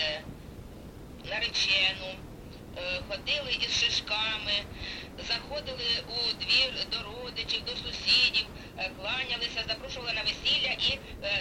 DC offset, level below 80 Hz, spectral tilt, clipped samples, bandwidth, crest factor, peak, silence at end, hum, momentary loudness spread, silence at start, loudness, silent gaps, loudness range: under 0.1%; -50 dBFS; -2 dB/octave; under 0.1%; 16.5 kHz; 20 dB; -12 dBFS; 0 s; none; 20 LU; 0 s; -28 LUFS; none; 3 LU